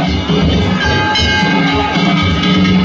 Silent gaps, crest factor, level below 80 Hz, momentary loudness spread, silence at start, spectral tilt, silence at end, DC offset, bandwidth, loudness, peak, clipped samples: none; 10 dB; -24 dBFS; 2 LU; 0 s; -5.5 dB/octave; 0 s; under 0.1%; 7.6 kHz; -12 LUFS; -2 dBFS; under 0.1%